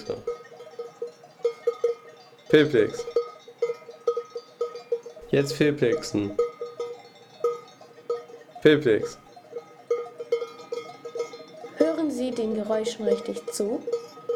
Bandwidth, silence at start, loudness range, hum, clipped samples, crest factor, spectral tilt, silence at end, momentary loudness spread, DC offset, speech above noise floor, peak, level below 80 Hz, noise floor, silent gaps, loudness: 14 kHz; 0 s; 3 LU; none; under 0.1%; 22 dB; -5.5 dB/octave; 0 s; 18 LU; under 0.1%; 26 dB; -6 dBFS; -64 dBFS; -49 dBFS; none; -27 LUFS